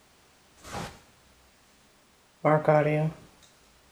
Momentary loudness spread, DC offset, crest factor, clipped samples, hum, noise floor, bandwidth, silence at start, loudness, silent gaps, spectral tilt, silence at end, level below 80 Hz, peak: 23 LU; under 0.1%; 22 dB; under 0.1%; none; -61 dBFS; 13 kHz; 0.65 s; -26 LUFS; none; -7.5 dB/octave; 0.75 s; -62 dBFS; -8 dBFS